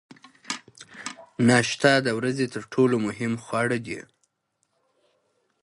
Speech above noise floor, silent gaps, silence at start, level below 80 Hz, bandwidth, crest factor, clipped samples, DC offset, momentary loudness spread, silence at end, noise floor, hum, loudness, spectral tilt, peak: 52 dB; none; 0.5 s; -66 dBFS; 11.5 kHz; 22 dB; under 0.1%; under 0.1%; 18 LU; 1.65 s; -75 dBFS; none; -24 LUFS; -5 dB/octave; -4 dBFS